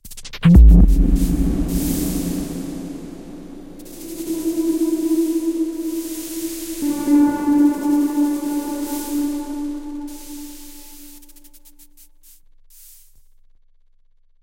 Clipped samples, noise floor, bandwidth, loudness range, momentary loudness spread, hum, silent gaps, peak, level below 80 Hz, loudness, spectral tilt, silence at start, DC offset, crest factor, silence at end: under 0.1%; -53 dBFS; 16.5 kHz; 15 LU; 21 LU; none; none; 0 dBFS; -22 dBFS; -19 LUFS; -7 dB/octave; 0.05 s; under 0.1%; 18 dB; 3.2 s